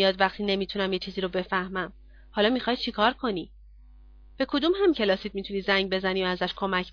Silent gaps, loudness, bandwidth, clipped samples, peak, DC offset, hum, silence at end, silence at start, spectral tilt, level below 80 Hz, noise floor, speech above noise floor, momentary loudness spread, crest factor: none; -27 LUFS; 5.4 kHz; under 0.1%; -6 dBFS; under 0.1%; none; 0 s; 0 s; -6.5 dB/octave; -50 dBFS; -50 dBFS; 24 dB; 9 LU; 20 dB